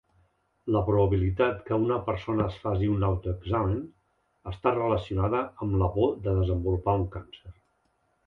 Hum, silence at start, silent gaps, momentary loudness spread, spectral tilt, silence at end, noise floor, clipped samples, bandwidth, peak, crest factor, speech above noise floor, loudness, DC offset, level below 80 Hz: none; 0.65 s; none; 9 LU; -10 dB/octave; 0.75 s; -72 dBFS; under 0.1%; 4.4 kHz; -10 dBFS; 18 dB; 45 dB; -27 LUFS; under 0.1%; -40 dBFS